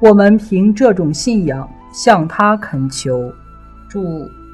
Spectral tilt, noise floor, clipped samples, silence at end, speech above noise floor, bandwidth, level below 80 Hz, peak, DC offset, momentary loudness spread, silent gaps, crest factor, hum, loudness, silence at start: -6 dB/octave; -37 dBFS; 0.6%; 0 s; 24 dB; 11.5 kHz; -40 dBFS; 0 dBFS; under 0.1%; 15 LU; none; 14 dB; none; -14 LUFS; 0 s